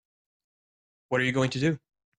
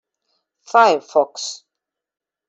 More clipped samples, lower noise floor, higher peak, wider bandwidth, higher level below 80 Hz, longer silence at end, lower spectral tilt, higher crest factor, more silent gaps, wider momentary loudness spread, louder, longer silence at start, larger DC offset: neither; first, under -90 dBFS vs -84 dBFS; second, -14 dBFS vs -2 dBFS; first, 10 kHz vs 8.2 kHz; first, -62 dBFS vs -74 dBFS; second, 0.4 s vs 0.95 s; first, -6 dB/octave vs -2 dB/octave; about the same, 18 dB vs 18 dB; neither; second, 6 LU vs 15 LU; second, -27 LUFS vs -17 LUFS; first, 1.1 s vs 0.75 s; neither